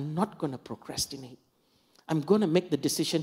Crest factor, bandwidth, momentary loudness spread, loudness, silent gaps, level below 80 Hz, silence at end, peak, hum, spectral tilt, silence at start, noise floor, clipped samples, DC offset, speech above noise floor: 20 dB; 16 kHz; 15 LU; -29 LUFS; none; -64 dBFS; 0 s; -10 dBFS; none; -5 dB/octave; 0 s; -68 dBFS; under 0.1%; under 0.1%; 39 dB